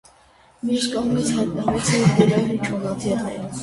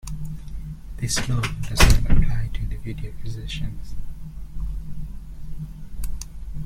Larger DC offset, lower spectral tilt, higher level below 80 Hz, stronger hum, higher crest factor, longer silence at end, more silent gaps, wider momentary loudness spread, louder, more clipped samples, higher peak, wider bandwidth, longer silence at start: neither; first, -5.5 dB/octave vs -4 dB/octave; second, -48 dBFS vs -26 dBFS; neither; about the same, 18 dB vs 20 dB; about the same, 0 s vs 0 s; neither; second, 8 LU vs 20 LU; first, -21 LUFS vs -26 LUFS; neither; about the same, -2 dBFS vs -2 dBFS; second, 11.5 kHz vs 15.5 kHz; first, 0.65 s vs 0.05 s